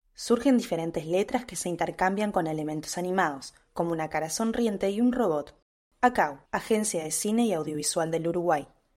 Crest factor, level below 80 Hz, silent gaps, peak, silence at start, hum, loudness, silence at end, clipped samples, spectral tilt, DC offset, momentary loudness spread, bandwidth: 18 dB; -58 dBFS; 5.62-5.91 s; -10 dBFS; 0.2 s; none; -28 LUFS; 0.35 s; under 0.1%; -4.5 dB/octave; under 0.1%; 7 LU; 16 kHz